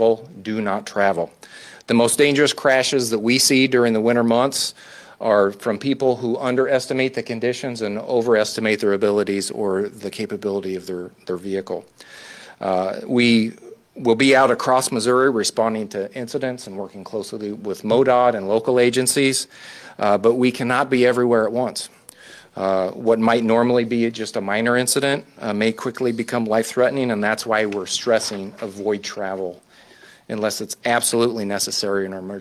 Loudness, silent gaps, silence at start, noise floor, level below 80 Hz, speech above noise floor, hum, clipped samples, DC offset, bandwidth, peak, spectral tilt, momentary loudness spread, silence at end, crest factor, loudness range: -20 LUFS; none; 0 s; -48 dBFS; -62 dBFS; 28 dB; none; under 0.1%; under 0.1%; 15 kHz; -4 dBFS; -4 dB/octave; 13 LU; 0 s; 16 dB; 6 LU